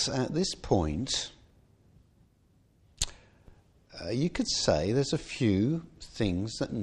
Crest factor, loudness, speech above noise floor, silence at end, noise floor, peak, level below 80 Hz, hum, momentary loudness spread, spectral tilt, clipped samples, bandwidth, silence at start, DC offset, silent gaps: 22 dB; -30 LUFS; 36 dB; 0 s; -65 dBFS; -10 dBFS; -48 dBFS; none; 9 LU; -4.5 dB/octave; under 0.1%; 14 kHz; 0 s; under 0.1%; none